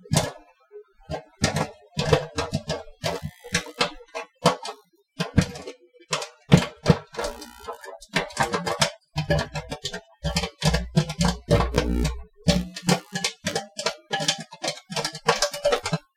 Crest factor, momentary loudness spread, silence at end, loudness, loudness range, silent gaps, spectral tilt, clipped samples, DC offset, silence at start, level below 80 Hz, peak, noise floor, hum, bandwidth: 24 dB; 11 LU; 0.15 s; -26 LUFS; 3 LU; none; -4.5 dB/octave; under 0.1%; under 0.1%; 0.05 s; -38 dBFS; -2 dBFS; -48 dBFS; none; 16 kHz